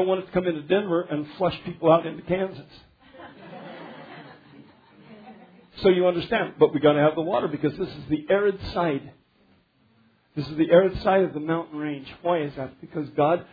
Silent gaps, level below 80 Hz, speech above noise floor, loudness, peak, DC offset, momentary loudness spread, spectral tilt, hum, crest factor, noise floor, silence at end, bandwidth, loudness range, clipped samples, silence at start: none; -54 dBFS; 39 dB; -24 LUFS; -4 dBFS; under 0.1%; 21 LU; -9 dB/octave; none; 20 dB; -62 dBFS; 0.1 s; 5 kHz; 7 LU; under 0.1%; 0 s